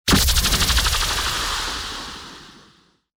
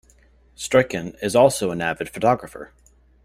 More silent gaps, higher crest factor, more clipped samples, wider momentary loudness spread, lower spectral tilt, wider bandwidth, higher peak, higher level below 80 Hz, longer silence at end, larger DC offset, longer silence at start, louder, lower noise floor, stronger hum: neither; about the same, 16 dB vs 20 dB; neither; about the same, 17 LU vs 15 LU; second, -2 dB/octave vs -4.5 dB/octave; first, over 20 kHz vs 15.5 kHz; second, -6 dBFS vs -2 dBFS; first, -28 dBFS vs -52 dBFS; about the same, 0.7 s vs 0.6 s; neither; second, 0.05 s vs 0.6 s; about the same, -19 LUFS vs -21 LUFS; about the same, -56 dBFS vs -55 dBFS; neither